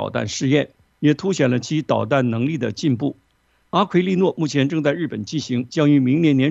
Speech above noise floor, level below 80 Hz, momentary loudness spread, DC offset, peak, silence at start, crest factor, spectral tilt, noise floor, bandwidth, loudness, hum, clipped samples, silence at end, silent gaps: 20 dB; -60 dBFS; 8 LU; under 0.1%; -4 dBFS; 0 s; 16 dB; -6.5 dB/octave; -39 dBFS; 8 kHz; -20 LUFS; none; under 0.1%; 0 s; none